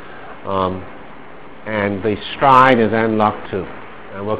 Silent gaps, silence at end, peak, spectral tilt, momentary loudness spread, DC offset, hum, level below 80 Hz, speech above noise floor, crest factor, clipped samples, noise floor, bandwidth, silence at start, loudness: none; 0 s; 0 dBFS; -10 dB/octave; 24 LU; 2%; none; -44 dBFS; 22 dB; 18 dB; 0.1%; -38 dBFS; 4 kHz; 0 s; -16 LUFS